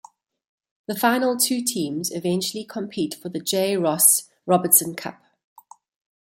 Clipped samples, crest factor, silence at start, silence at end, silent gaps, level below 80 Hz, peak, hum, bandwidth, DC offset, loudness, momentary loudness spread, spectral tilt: under 0.1%; 22 dB; 0.9 s; 1.1 s; none; -70 dBFS; 0 dBFS; none; 16.5 kHz; under 0.1%; -20 LUFS; 16 LU; -3 dB/octave